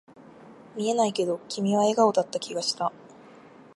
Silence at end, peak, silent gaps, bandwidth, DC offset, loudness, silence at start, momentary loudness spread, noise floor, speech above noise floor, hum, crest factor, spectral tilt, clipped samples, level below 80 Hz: 0.7 s; -6 dBFS; none; 11.5 kHz; under 0.1%; -26 LUFS; 0.4 s; 10 LU; -50 dBFS; 25 dB; none; 20 dB; -4.5 dB/octave; under 0.1%; -78 dBFS